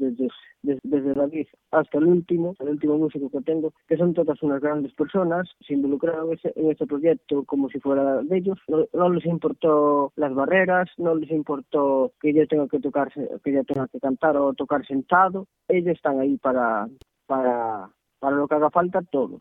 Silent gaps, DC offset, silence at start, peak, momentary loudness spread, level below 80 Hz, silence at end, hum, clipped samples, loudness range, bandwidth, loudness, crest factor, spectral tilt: none; under 0.1%; 0 s; -4 dBFS; 8 LU; -64 dBFS; 0 s; none; under 0.1%; 3 LU; 3.9 kHz; -23 LUFS; 18 dB; -10 dB/octave